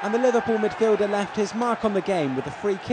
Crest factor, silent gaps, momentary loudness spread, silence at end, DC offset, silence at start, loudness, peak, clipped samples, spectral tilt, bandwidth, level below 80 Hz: 14 dB; none; 6 LU; 0 s; under 0.1%; 0 s; -24 LUFS; -10 dBFS; under 0.1%; -5.5 dB/octave; 9.8 kHz; -60 dBFS